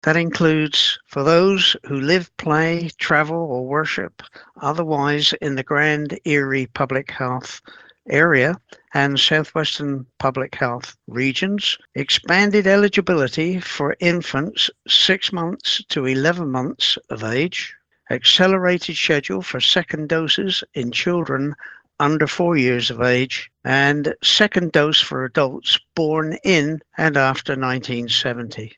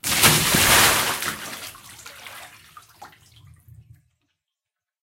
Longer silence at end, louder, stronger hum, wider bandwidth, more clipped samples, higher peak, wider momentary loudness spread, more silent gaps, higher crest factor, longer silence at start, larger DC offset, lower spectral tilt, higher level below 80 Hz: second, 0.1 s vs 1.95 s; about the same, -18 LUFS vs -16 LUFS; neither; second, 8.6 kHz vs 17 kHz; neither; about the same, 0 dBFS vs 0 dBFS; second, 10 LU vs 26 LU; neither; about the same, 20 dB vs 24 dB; about the same, 0.05 s vs 0.05 s; neither; first, -4.5 dB/octave vs -1.5 dB/octave; second, -58 dBFS vs -46 dBFS